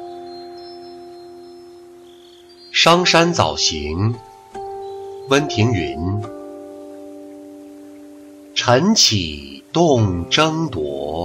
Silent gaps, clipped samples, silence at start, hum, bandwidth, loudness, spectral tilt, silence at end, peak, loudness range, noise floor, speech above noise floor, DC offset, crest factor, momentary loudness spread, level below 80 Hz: none; under 0.1%; 0 s; none; 15 kHz; -16 LUFS; -4 dB/octave; 0 s; -2 dBFS; 6 LU; -44 dBFS; 27 dB; under 0.1%; 18 dB; 25 LU; -44 dBFS